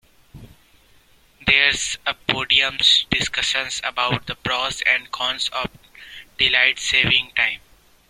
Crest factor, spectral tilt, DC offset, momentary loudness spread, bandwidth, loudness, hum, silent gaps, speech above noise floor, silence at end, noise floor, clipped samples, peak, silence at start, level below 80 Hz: 22 dB; -1.5 dB/octave; under 0.1%; 10 LU; 16.5 kHz; -18 LUFS; none; none; 34 dB; 0.55 s; -54 dBFS; under 0.1%; 0 dBFS; 0.35 s; -48 dBFS